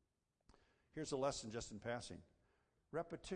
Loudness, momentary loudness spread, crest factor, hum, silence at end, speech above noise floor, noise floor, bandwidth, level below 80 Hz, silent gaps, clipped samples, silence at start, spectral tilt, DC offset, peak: -47 LUFS; 13 LU; 20 dB; none; 0 s; 34 dB; -80 dBFS; 10 kHz; -70 dBFS; none; under 0.1%; 0.95 s; -4.5 dB/octave; under 0.1%; -28 dBFS